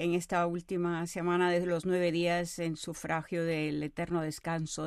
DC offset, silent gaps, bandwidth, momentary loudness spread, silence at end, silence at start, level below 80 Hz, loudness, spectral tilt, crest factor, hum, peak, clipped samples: under 0.1%; none; 13.5 kHz; 7 LU; 0 s; 0 s; -60 dBFS; -32 LUFS; -5.5 dB/octave; 16 dB; none; -16 dBFS; under 0.1%